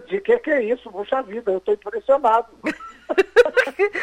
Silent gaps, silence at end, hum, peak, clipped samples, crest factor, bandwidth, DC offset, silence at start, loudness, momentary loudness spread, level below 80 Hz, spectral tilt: none; 0 s; none; -4 dBFS; under 0.1%; 16 dB; 11.5 kHz; under 0.1%; 0 s; -20 LUFS; 11 LU; -56 dBFS; -4.5 dB/octave